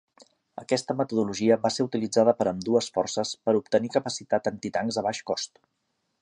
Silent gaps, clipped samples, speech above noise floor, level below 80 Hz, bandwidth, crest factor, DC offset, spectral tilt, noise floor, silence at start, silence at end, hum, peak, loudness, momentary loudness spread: none; under 0.1%; 34 dB; -66 dBFS; 11 kHz; 20 dB; under 0.1%; -4.5 dB/octave; -59 dBFS; 0.55 s; 0.75 s; none; -6 dBFS; -26 LUFS; 8 LU